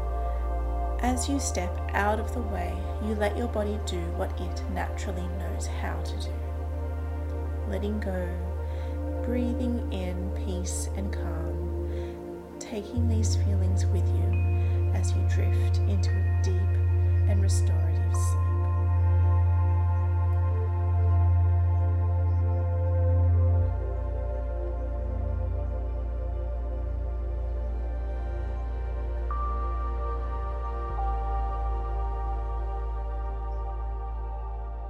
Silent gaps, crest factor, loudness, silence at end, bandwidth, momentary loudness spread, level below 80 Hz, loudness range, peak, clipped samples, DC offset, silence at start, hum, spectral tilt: none; 16 dB; -29 LUFS; 0 s; 11.5 kHz; 9 LU; -34 dBFS; 8 LU; -10 dBFS; under 0.1%; under 0.1%; 0 s; none; -7 dB/octave